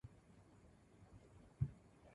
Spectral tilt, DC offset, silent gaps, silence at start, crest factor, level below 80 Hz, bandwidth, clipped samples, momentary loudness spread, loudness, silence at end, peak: -8.5 dB/octave; under 0.1%; none; 0.05 s; 26 dB; -64 dBFS; 11 kHz; under 0.1%; 21 LU; -48 LUFS; 0 s; -26 dBFS